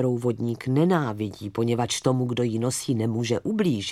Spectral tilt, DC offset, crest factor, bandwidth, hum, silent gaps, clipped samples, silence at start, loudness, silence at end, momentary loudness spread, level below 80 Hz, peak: -5.5 dB/octave; under 0.1%; 18 dB; 15 kHz; none; none; under 0.1%; 0 s; -25 LUFS; 0 s; 6 LU; -60 dBFS; -6 dBFS